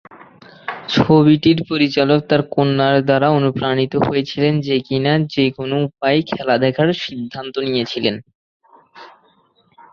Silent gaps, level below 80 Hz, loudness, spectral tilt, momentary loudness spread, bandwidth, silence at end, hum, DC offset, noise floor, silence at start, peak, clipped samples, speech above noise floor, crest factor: 8.35-8.60 s; -52 dBFS; -16 LUFS; -7.5 dB/octave; 10 LU; 6.8 kHz; 0.85 s; none; under 0.1%; -57 dBFS; 0.15 s; 0 dBFS; under 0.1%; 41 dB; 16 dB